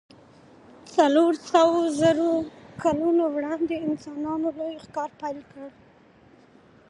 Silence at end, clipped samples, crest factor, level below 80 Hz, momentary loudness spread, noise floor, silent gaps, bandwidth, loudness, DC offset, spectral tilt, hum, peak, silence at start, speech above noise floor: 1.2 s; under 0.1%; 20 dB; -62 dBFS; 15 LU; -55 dBFS; none; 11 kHz; -24 LUFS; under 0.1%; -5.5 dB/octave; none; -6 dBFS; 0.85 s; 31 dB